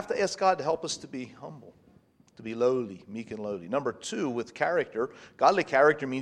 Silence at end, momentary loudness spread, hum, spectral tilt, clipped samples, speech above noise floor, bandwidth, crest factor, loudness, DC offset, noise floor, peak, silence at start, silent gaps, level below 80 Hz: 0 s; 17 LU; none; -4.5 dB/octave; under 0.1%; 32 dB; 11 kHz; 22 dB; -28 LUFS; under 0.1%; -61 dBFS; -8 dBFS; 0 s; none; -72 dBFS